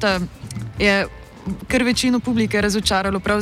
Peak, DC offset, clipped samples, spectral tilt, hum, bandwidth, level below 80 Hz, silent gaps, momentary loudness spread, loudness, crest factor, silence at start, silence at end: -4 dBFS; under 0.1%; under 0.1%; -4.5 dB/octave; none; 16 kHz; -38 dBFS; none; 13 LU; -19 LUFS; 16 dB; 0 s; 0 s